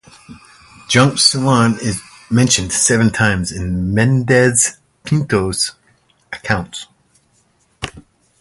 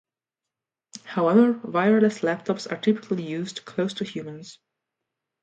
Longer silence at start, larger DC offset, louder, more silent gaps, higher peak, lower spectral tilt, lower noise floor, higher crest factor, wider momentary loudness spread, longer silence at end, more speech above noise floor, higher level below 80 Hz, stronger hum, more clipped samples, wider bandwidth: second, 0.3 s vs 0.95 s; neither; first, -15 LUFS vs -24 LUFS; neither; first, 0 dBFS vs -6 dBFS; second, -4 dB/octave vs -6.5 dB/octave; second, -58 dBFS vs -88 dBFS; about the same, 16 dB vs 18 dB; about the same, 18 LU vs 17 LU; second, 0.4 s vs 0.9 s; second, 43 dB vs 65 dB; first, -40 dBFS vs -74 dBFS; neither; neither; first, 11.5 kHz vs 9 kHz